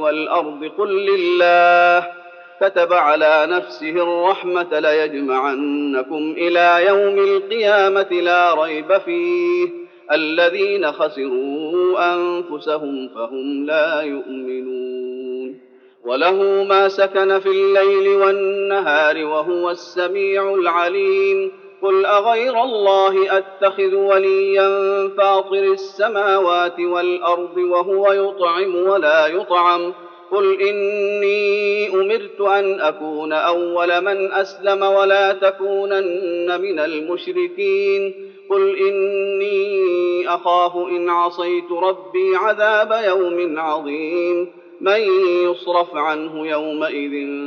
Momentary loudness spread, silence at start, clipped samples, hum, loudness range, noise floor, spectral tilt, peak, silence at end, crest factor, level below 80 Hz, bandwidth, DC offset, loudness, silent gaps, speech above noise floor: 9 LU; 0 s; under 0.1%; none; 4 LU; -47 dBFS; -1 dB/octave; -2 dBFS; 0 s; 14 dB; under -90 dBFS; 6.6 kHz; under 0.1%; -17 LUFS; none; 30 dB